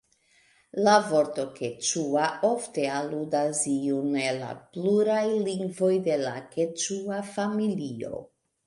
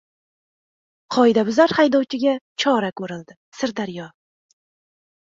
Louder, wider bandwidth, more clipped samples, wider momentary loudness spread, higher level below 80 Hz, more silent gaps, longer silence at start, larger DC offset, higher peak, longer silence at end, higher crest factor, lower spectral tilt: second, -27 LUFS vs -19 LUFS; first, 11.5 kHz vs 7.8 kHz; neither; second, 10 LU vs 16 LU; second, -72 dBFS vs -66 dBFS; second, none vs 2.41-2.56 s, 3.37-3.52 s; second, 0.75 s vs 1.1 s; neither; second, -8 dBFS vs -2 dBFS; second, 0.4 s vs 1.15 s; about the same, 18 dB vs 20 dB; about the same, -4 dB/octave vs -5 dB/octave